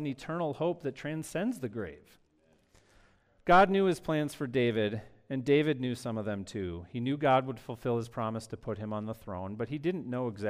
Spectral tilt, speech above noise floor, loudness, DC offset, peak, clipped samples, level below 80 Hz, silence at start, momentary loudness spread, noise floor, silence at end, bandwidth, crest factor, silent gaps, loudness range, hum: -6.5 dB/octave; 37 dB; -32 LUFS; under 0.1%; -12 dBFS; under 0.1%; -60 dBFS; 0 s; 13 LU; -68 dBFS; 0 s; 15.5 kHz; 18 dB; none; 5 LU; none